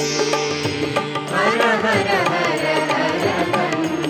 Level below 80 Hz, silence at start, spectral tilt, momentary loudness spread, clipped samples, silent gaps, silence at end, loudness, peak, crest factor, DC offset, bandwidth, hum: -58 dBFS; 0 s; -4 dB/octave; 5 LU; under 0.1%; none; 0 s; -19 LUFS; -4 dBFS; 14 dB; under 0.1%; 18 kHz; none